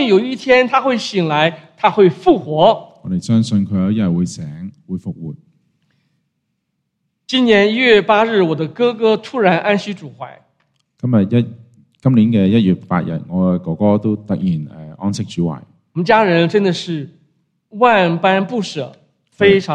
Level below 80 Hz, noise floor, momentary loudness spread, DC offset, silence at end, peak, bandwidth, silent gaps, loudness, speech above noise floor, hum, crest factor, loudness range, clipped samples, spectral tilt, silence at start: -54 dBFS; -71 dBFS; 16 LU; under 0.1%; 0 s; 0 dBFS; 9.8 kHz; none; -15 LUFS; 57 dB; none; 16 dB; 6 LU; under 0.1%; -6.5 dB/octave; 0 s